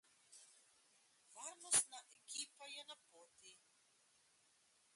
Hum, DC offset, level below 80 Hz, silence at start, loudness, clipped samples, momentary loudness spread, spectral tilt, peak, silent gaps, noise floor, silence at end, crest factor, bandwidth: none; under 0.1%; under -90 dBFS; 0.3 s; -42 LUFS; under 0.1%; 27 LU; 1.5 dB/octave; -22 dBFS; none; -76 dBFS; 1.4 s; 28 dB; 11.5 kHz